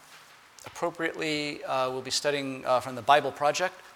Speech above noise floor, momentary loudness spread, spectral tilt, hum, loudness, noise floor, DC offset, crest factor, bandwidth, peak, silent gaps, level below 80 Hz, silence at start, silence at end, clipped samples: 25 dB; 10 LU; -3 dB/octave; none; -28 LUFS; -53 dBFS; under 0.1%; 22 dB; 17.5 kHz; -6 dBFS; none; -70 dBFS; 0.1 s; 0 s; under 0.1%